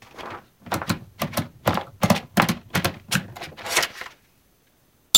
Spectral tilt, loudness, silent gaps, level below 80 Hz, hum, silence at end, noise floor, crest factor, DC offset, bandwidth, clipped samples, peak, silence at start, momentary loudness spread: -3 dB/octave; -25 LUFS; none; -52 dBFS; none; 0 s; -61 dBFS; 26 dB; under 0.1%; 17 kHz; under 0.1%; 0 dBFS; 0.15 s; 16 LU